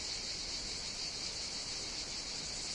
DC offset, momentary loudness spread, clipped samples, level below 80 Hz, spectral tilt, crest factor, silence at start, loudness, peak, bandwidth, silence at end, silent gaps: under 0.1%; 1 LU; under 0.1%; -56 dBFS; -0.5 dB/octave; 14 dB; 0 s; -38 LUFS; -26 dBFS; 11.5 kHz; 0 s; none